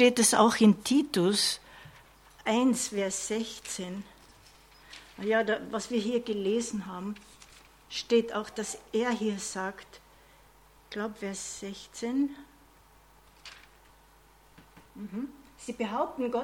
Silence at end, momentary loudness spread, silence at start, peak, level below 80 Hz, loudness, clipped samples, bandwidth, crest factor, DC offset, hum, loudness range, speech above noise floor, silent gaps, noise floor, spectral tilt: 0 s; 22 LU; 0 s; -6 dBFS; -64 dBFS; -29 LUFS; under 0.1%; 16.5 kHz; 24 dB; under 0.1%; none; 11 LU; 30 dB; none; -59 dBFS; -3.5 dB/octave